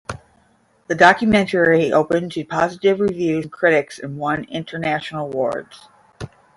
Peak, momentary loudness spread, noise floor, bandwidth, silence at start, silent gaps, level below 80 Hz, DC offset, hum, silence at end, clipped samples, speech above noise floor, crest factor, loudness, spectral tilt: 0 dBFS; 17 LU; -58 dBFS; 11.5 kHz; 0.1 s; none; -52 dBFS; under 0.1%; none; 0.3 s; under 0.1%; 40 dB; 18 dB; -18 LUFS; -6 dB/octave